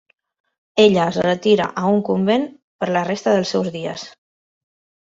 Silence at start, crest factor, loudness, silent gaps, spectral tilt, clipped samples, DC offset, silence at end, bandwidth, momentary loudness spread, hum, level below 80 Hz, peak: 0.75 s; 18 dB; -18 LUFS; 2.62-2.79 s; -6 dB/octave; under 0.1%; under 0.1%; 0.9 s; 7.8 kHz; 14 LU; none; -60 dBFS; -2 dBFS